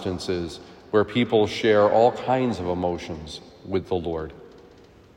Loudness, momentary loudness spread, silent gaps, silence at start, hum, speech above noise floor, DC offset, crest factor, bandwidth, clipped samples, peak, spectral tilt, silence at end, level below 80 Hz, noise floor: -23 LUFS; 17 LU; none; 0 s; none; 27 dB; under 0.1%; 18 dB; 11.5 kHz; under 0.1%; -6 dBFS; -6 dB/octave; 0.7 s; -54 dBFS; -50 dBFS